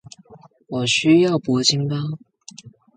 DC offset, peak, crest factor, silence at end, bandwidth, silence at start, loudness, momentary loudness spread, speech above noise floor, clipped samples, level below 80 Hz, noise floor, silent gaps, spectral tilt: under 0.1%; -2 dBFS; 18 dB; 0.25 s; 9.4 kHz; 0.3 s; -19 LUFS; 15 LU; 30 dB; under 0.1%; -62 dBFS; -48 dBFS; none; -4.5 dB/octave